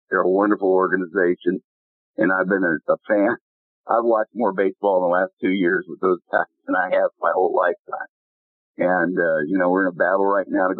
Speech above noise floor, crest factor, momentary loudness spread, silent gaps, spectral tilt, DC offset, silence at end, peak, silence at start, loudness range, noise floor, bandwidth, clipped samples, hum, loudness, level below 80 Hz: over 70 dB; 18 dB; 5 LU; 1.64-2.14 s, 3.41-3.84 s, 5.33-5.37 s, 7.79-7.85 s, 8.09-8.74 s; -11 dB/octave; under 0.1%; 0 s; -4 dBFS; 0.1 s; 1 LU; under -90 dBFS; 4.2 kHz; under 0.1%; none; -20 LUFS; -72 dBFS